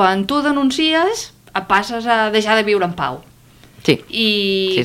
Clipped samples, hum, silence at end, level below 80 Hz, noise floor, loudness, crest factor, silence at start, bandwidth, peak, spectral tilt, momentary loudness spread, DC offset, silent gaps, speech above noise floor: under 0.1%; none; 0 s; -52 dBFS; -45 dBFS; -17 LUFS; 16 dB; 0 s; 16.5 kHz; -2 dBFS; -4 dB/octave; 9 LU; under 0.1%; none; 29 dB